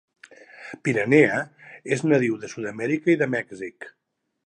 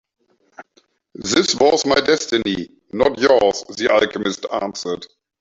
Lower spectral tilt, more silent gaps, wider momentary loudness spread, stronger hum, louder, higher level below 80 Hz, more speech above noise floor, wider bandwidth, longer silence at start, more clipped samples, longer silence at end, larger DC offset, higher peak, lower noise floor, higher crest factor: first, -6.5 dB/octave vs -3 dB/octave; neither; first, 22 LU vs 12 LU; neither; second, -22 LUFS vs -18 LUFS; second, -70 dBFS vs -52 dBFS; second, 23 dB vs 42 dB; first, 10 kHz vs 8 kHz; about the same, 0.6 s vs 0.6 s; neither; first, 0.55 s vs 0.35 s; neither; about the same, -2 dBFS vs -2 dBFS; second, -46 dBFS vs -60 dBFS; about the same, 22 dB vs 18 dB